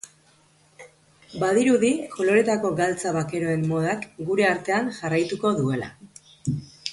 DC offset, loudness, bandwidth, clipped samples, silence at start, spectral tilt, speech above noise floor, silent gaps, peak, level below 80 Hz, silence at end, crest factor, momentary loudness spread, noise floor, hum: under 0.1%; -24 LUFS; 11.5 kHz; under 0.1%; 0.05 s; -5.5 dB/octave; 36 dB; none; -6 dBFS; -60 dBFS; 0 s; 18 dB; 11 LU; -59 dBFS; none